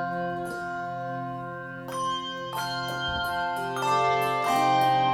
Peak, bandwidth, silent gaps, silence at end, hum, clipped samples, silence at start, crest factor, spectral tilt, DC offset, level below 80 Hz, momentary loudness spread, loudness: -12 dBFS; 18.5 kHz; none; 0 s; none; under 0.1%; 0 s; 16 dB; -4 dB/octave; under 0.1%; -56 dBFS; 12 LU; -28 LUFS